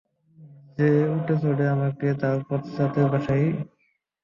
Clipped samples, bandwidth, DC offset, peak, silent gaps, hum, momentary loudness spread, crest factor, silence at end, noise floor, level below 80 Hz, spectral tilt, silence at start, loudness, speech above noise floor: under 0.1%; 6 kHz; under 0.1%; -8 dBFS; none; none; 8 LU; 16 dB; 0.6 s; -50 dBFS; -58 dBFS; -10 dB/octave; 0.4 s; -24 LUFS; 28 dB